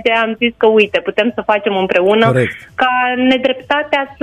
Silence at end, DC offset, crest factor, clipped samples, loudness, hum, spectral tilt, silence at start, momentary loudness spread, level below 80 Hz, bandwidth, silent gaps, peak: 0.1 s; under 0.1%; 14 dB; under 0.1%; -14 LUFS; none; -6.5 dB/octave; 0 s; 5 LU; -50 dBFS; 10.5 kHz; none; 0 dBFS